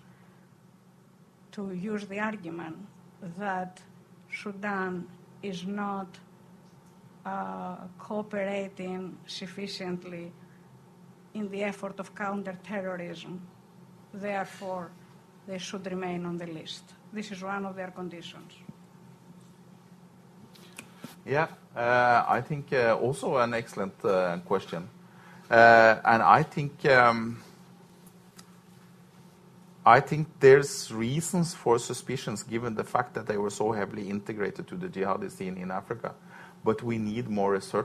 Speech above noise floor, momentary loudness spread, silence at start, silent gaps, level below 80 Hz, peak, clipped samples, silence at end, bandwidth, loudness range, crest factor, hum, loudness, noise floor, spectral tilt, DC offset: 30 dB; 22 LU; 1.55 s; none; -66 dBFS; -4 dBFS; under 0.1%; 0 s; 14 kHz; 15 LU; 26 dB; none; -28 LUFS; -58 dBFS; -5 dB/octave; under 0.1%